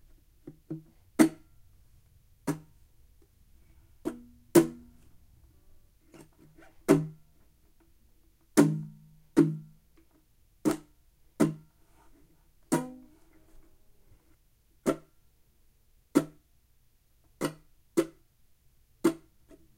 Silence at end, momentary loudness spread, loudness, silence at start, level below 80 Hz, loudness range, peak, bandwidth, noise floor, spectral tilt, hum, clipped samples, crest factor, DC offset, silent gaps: 0.6 s; 20 LU; -30 LUFS; 0.45 s; -62 dBFS; 7 LU; -6 dBFS; 16 kHz; -65 dBFS; -6 dB/octave; none; under 0.1%; 26 dB; under 0.1%; none